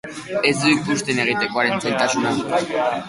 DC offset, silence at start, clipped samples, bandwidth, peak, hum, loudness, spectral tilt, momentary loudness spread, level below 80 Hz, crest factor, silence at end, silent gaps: under 0.1%; 0.05 s; under 0.1%; 11.5 kHz; -2 dBFS; none; -19 LUFS; -4 dB/octave; 4 LU; -58 dBFS; 20 dB; 0 s; none